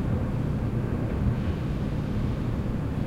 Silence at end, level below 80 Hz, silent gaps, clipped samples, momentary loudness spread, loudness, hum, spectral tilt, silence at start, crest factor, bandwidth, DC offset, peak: 0 s; -34 dBFS; none; under 0.1%; 2 LU; -29 LUFS; none; -9 dB/octave; 0 s; 12 dB; 11 kHz; under 0.1%; -14 dBFS